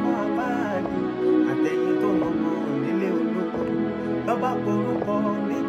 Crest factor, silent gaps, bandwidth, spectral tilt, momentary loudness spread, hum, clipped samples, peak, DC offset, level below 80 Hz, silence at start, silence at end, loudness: 12 dB; none; 8 kHz; -7.5 dB/octave; 4 LU; none; under 0.1%; -10 dBFS; under 0.1%; -56 dBFS; 0 s; 0 s; -24 LUFS